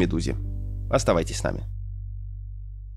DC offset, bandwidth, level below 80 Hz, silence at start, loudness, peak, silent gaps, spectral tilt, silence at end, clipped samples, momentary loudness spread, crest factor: under 0.1%; 12.5 kHz; -34 dBFS; 0 s; -28 LUFS; -8 dBFS; none; -5.5 dB/octave; 0 s; under 0.1%; 16 LU; 18 dB